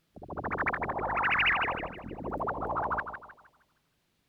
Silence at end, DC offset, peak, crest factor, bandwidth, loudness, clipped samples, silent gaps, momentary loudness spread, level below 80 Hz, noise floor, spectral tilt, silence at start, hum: 0.95 s; under 0.1%; -16 dBFS; 18 dB; 17.5 kHz; -30 LUFS; under 0.1%; none; 15 LU; -52 dBFS; -75 dBFS; -6 dB/octave; 0.15 s; none